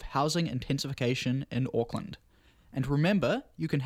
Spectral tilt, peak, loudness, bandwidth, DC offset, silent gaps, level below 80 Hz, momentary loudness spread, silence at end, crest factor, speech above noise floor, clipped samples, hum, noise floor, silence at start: -6 dB/octave; -12 dBFS; -30 LUFS; 15.5 kHz; under 0.1%; none; -52 dBFS; 12 LU; 0 s; 18 dB; 30 dB; under 0.1%; none; -60 dBFS; 0 s